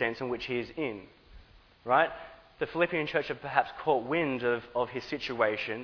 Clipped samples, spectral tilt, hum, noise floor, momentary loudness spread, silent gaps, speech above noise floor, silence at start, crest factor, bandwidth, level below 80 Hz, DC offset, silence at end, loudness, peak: under 0.1%; -6.5 dB/octave; none; -55 dBFS; 9 LU; none; 25 dB; 0 s; 22 dB; 5.4 kHz; -60 dBFS; under 0.1%; 0 s; -30 LUFS; -8 dBFS